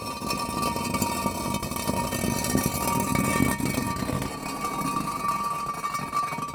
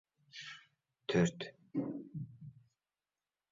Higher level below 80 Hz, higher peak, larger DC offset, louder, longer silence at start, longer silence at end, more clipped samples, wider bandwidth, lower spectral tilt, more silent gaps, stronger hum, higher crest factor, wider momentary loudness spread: first, -44 dBFS vs -70 dBFS; first, -8 dBFS vs -20 dBFS; neither; first, -27 LUFS vs -39 LUFS; second, 0 s vs 0.35 s; second, 0 s vs 1 s; neither; first, over 20 kHz vs 7.4 kHz; second, -4 dB/octave vs -5.5 dB/octave; neither; second, none vs 50 Hz at -65 dBFS; about the same, 20 dB vs 22 dB; second, 5 LU vs 22 LU